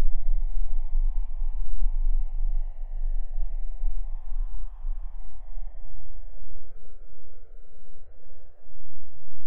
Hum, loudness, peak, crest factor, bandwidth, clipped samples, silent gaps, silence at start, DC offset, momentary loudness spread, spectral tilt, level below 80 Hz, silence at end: none; -36 LUFS; -6 dBFS; 12 dB; 1.1 kHz; under 0.1%; none; 0 s; under 0.1%; 23 LU; -10 dB/octave; -26 dBFS; 0 s